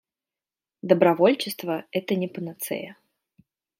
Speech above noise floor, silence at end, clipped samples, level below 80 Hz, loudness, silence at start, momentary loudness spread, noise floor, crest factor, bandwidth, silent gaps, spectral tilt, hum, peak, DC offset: over 67 dB; 0.9 s; under 0.1%; -74 dBFS; -24 LUFS; 0.85 s; 14 LU; under -90 dBFS; 22 dB; 16.5 kHz; none; -5.5 dB/octave; none; -4 dBFS; under 0.1%